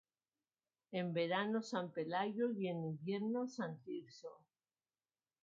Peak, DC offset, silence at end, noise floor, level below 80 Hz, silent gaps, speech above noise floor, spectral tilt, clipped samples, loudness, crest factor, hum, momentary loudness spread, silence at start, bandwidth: -24 dBFS; under 0.1%; 1.05 s; under -90 dBFS; under -90 dBFS; none; over 49 dB; -5 dB/octave; under 0.1%; -41 LUFS; 18 dB; none; 11 LU; 0.9 s; 7.4 kHz